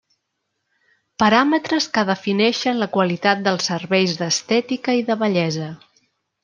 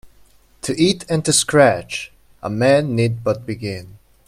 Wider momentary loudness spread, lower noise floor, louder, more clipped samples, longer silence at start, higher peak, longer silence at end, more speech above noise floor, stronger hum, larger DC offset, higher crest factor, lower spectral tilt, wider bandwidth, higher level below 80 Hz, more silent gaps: second, 5 LU vs 15 LU; first, -75 dBFS vs -52 dBFS; about the same, -19 LUFS vs -18 LUFS; neither; first, 1.2 s vs 0.05 s; about the same, -2 dBFS vs 0 dBFS; first, 0.7 s vs 0.3 s; first, 56 dB vs 34 dB; neither; neither; about the same, 18 dB vs 18 dB; about the same, -4.5 dB/octave vs -4.5 dB/octave; second, 10 kHz vs 15 kHz; second, -64 dBFS vs -52 dBFS; neither